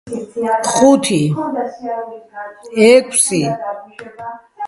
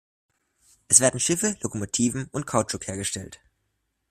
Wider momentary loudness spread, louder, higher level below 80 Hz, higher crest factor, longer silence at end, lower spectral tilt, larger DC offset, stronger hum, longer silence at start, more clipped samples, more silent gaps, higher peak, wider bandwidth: first, 21 LU vs 14 LU; first, -14 LUFS vs -23 LUFS; about the same, -58 dBFS vs -58 dBFS; second, 16 dB vs 26 dB; second, 0 s vs 0.75 s; about the same, -4 dB/octave vs -3 dB/octave; neither; neither; second, 0.05 s vs 0.9 s; neither; neither; about the same, 0 dBFS vs 0 dBFS; second, 11.5 kHz vs 15.5 kHz